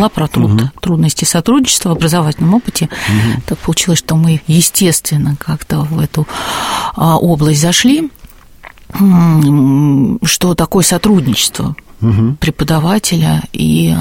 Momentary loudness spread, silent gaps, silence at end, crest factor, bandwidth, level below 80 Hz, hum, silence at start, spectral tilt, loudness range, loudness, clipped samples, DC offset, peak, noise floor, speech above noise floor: 7 LU; none; 0 s; 12 dB; 17 kHz; -34 dBFS; none; 0 s; -5 dB/octave; 2 LU; -11 LUFS; under 0.1%; under 0.1%; 0 dBFS; -36 dBFS; 25 dB